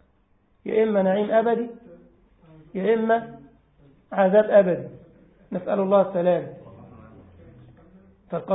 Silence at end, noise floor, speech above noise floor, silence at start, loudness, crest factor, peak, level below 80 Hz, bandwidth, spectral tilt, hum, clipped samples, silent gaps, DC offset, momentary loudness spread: 0 s; -63 dBFS; 42 dB; 0.65 s; -22 LUFS; 20 dB; -4 dBFS; -62 dBFS; 4 kHz; -11.5 dB/octave; none; under 0.1%; none; under 0.1%; 18 LU